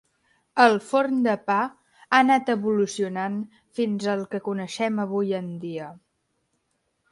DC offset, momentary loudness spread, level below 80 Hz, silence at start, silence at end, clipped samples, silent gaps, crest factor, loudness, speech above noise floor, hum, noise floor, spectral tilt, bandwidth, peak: under 0.1%; 14 LU; -72 dBFS; 0.55 s; 1.15 s; under 0.1%; none; 22 dB; -24 LUFS; 50 dB; none; -74 dBFS; -5.5 dB/octave; 11.5 kHz; -2 dBFS